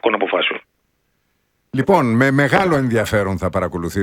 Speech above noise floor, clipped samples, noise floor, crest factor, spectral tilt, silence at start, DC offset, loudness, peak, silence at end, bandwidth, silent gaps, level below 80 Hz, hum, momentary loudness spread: 50 dB; under 0.1%; -67 dBFS; 18 dB; -6 dB/octave; 0.05 s; under 0.1%; -17 LUFS; 0 dBFS; 0 s; 17 kHz; none; -44 dBFS; none; 8 LU